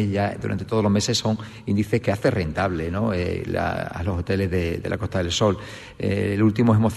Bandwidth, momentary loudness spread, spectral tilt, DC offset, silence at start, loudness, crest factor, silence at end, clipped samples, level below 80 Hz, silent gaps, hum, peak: 12.5 kHz; 7 LU; -6 dB/octave; under 0.1%; 0 s; -23 LUFS; 16 dB; 0 s; under 0.1%; -46 dBFS; none; none; -8 dBFS